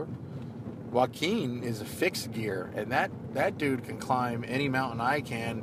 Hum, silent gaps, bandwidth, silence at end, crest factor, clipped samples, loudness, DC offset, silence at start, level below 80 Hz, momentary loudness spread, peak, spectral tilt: none; none; 15.5 kHz; 0 s; 20 dB; under 0.1%; -31 LUFS; under 0.1%; 0 s; -62 dBFS; 10 LU; -12 dBFS; -5.5 dB/octave